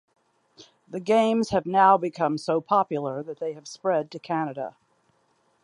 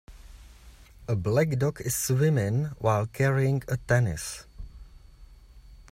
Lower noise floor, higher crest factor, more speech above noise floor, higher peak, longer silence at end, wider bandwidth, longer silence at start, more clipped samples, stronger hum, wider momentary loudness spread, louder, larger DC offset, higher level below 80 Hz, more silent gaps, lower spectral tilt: first, -67 dBFS vs -51 dBFS; about the same, 20 dB vs 18 dB; first, 43 dB vs 25 dB; first, -6 dBFS vs -10 dBFS; first, 0.95 s vs 0.1 s; second, 11 kHz vs 16 kHz; first, 0.6 s vs 0.1 s; neither; neither; second, 14 LU vs 18 LU; about the same, -24 LUFS vs -26 LUFS; neither; second, -64 dBFS vs -48 dBFS; neither; about the same, -6 dB/octave vs -6 dB/octave